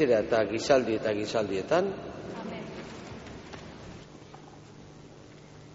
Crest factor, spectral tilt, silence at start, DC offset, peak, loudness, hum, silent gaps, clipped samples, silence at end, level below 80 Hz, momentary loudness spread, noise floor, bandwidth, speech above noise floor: 22 dB; -4 dB/octave; 0 s; under 0.1%; -8 dBFS; -29 LUFS; none; none; under 0.1%; 0 s; -58 dBFS; 25 LU; -50 dBFS; 8 kHz; 23 dB